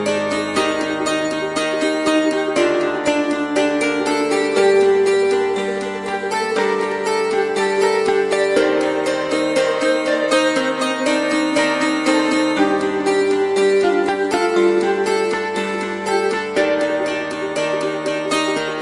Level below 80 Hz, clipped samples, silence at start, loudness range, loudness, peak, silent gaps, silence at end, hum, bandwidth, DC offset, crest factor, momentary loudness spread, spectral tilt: -56 dBFS; under 0.1%; 0 s; 2 LU; -18 LUFS; -2 dBFS; none; 0 s; none; 11.5 kHz; under 0.1%; 16 dB; 5 LU; -3.5 dB/octave